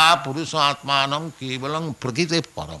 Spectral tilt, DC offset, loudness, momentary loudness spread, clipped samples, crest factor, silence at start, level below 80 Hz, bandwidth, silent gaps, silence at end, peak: -3.5 dB/octave; under 0.1%; -22 LUFS; 9 LU; under 0.1%; 18 dB; 0 s; -54 dBFS; 12 kHz; none; 0 s; -4 dBFS